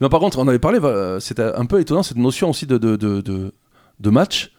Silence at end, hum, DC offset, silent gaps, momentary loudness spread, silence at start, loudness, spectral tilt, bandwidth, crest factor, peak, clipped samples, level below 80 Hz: 0.1 s; none; under 0.1%; none; 8 LU; 0 s; -18 LUFS; -6 dB/octave; 17 kHz; 18 dB; 0 dBFS; under 0.1%; -40 dBFS